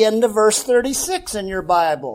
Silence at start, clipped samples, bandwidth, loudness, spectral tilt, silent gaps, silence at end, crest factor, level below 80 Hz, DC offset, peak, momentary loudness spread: 0 s; under 0.1%; 16.5 kHz; -18 LUFS; -2.5 dB/octave; none; 0 s; 14 dB; -46 dBFS; under 0.1%; -4 dBFS; 9 LU